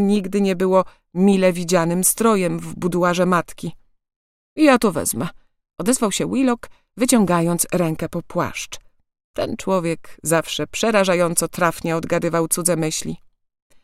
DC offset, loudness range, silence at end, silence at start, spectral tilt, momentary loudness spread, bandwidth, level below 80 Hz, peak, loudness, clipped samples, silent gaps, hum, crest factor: under 0.1%; 3 LU; 0.65 s; 0 s; -4.5 dB/octave; 11 LU; 16.5 kHz; -50 dBFS; 0 dBFS; -19 LUFS; under 0.1%; 4.16-4.56 s, 9.24-9.34 s; none; 20 dB